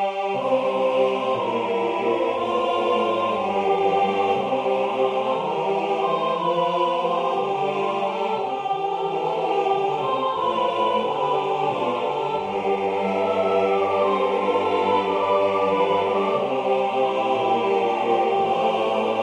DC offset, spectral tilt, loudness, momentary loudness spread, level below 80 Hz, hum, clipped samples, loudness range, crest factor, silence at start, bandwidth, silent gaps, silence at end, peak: under 0.1%; -5.5 dB/octave; -22 LUFS; 4 LU; -66 dBFS; none; under 0.1%; 2 LU; 14 dB; 0 s; 10 kHz; none; 0 s; -8 dBFS